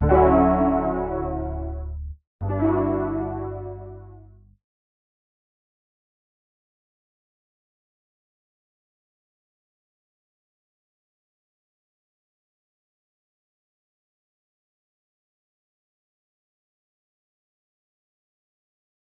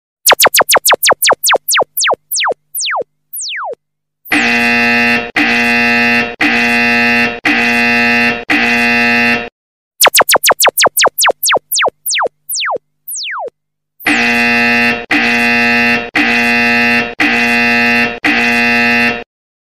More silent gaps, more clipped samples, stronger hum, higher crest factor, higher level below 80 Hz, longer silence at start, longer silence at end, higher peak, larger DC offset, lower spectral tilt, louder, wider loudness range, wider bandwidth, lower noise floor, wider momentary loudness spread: second, 2.27-2.39 s vs 9.52-9.91 s; neither; first, 50 Hz at -60 dBFS vs none; first, 24 dB vs 12 dB; first, -38 dBFS vs -46 dBFS; second, 0 s vs 0.25 s; first, 14.9 s vs 0.5 s; second, -4 dBFS vs 0 dBFS; second, under 0.1% vs 0.6%; first, -10 dB/octave vs -1.5 dB/octave; second, -23 LUFS vs -10 LUFS; first, 17 LU vs 4 LU; second, 3.5 kHz vs 16 kHz; second, -48 dBFS vs -73 dBFS; first, 20 LU vs 10 LU